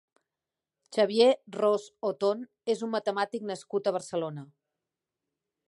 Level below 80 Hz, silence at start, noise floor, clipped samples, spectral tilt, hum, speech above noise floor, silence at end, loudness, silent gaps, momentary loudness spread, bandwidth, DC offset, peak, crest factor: -84 dBFS; 0.9 s; -90 dBFS; under 0.1%; -5 dB/octave; none; 62 dB; 1.25 s; -29 LUFS; none; 11 LU; 11.5 kHz; under 0.1%; -10 dBFS; 20 dB